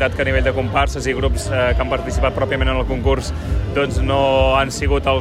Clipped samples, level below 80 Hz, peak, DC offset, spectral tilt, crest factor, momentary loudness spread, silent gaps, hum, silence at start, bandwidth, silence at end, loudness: under 0.1%; -22 dBFS; -4 dBFS; under 0.1%; -5.5 dB/octave; 14 dB; 5 LU; none; none; 0 s; 13 kHz; 0 s; -18 LUFS